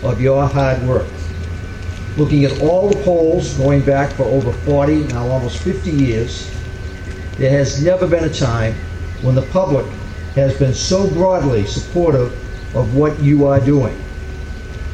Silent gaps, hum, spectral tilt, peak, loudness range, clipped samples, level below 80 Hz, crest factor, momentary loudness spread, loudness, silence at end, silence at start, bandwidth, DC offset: none; none; -7 dB/octave; 0 dBFS; 3 LU; under 0.1%; -28 dBFS; 16 dB; 13 LU; -16 LUFS; 0 s; 0 s; 9.2 kHz; under 0.1%